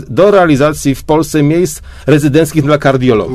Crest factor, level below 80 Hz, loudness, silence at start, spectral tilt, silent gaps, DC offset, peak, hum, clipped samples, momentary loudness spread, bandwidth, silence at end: 10 dB; -34 dBFS; -10 LUFS; 0 s; -6.5 dB/octave; none; under 0.1%; 0 dBFS; none; 0.6%; 6 LU; 14 kHz; 0 s